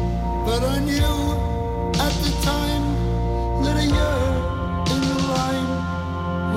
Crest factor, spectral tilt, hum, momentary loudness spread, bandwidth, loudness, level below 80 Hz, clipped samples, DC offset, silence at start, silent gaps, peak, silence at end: 12 dB; -5.5 dB/octave; none; 5 LU; 16 kHz; -22 LUFS; -26 dBFS; under 0.1%; under 0.1%; 0 s; none; -10 dBFS; 0 s